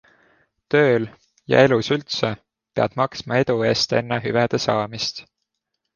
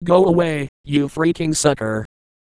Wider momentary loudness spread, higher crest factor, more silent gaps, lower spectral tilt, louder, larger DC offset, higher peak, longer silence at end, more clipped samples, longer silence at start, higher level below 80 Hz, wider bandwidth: about the same, 10 LU vs 12 LU; about the same, 20 dB vs 18 dB; second, none vs 0.69-0.84 s; about the same, -5 dB/octave vs -5.5 dB/octave; about the same, -20 LUFS vs -19 LUFS; neither; about the same, -2 dBFS vs -2 dBFS; first, 0.75 s vs 0.4 s; neither; first, 0.7 s vs 0 s; second, -56 dBFS vs -48 dBFS; second, 7.4 kHz vs 11 kHz